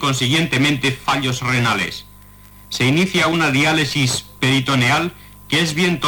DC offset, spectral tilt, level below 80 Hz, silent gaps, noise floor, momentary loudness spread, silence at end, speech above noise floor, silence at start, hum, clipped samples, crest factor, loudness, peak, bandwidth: under 0.1%; -4 dB/octave; -46 dBFS; none; -43 dBFS; 5 LU; 0 s; 25 dB; 0 s; 50 Hz at -40 dBFS; under 0.1%; 12 dB; -17 LUFS; -6 dBFS; 19 kHz